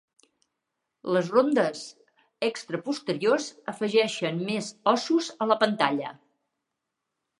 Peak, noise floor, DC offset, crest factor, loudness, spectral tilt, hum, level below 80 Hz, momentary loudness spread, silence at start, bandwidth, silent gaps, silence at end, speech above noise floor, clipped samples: -6 dBFS; -83 dBFS; under 0.1%; 22 dB; -26 LUFS; -4.5 dB/octave; none; -80 dBFS; 11 LU; 1.05 s; 11.5 kHz; none; 1.25 s; 58 dB; under 0.1%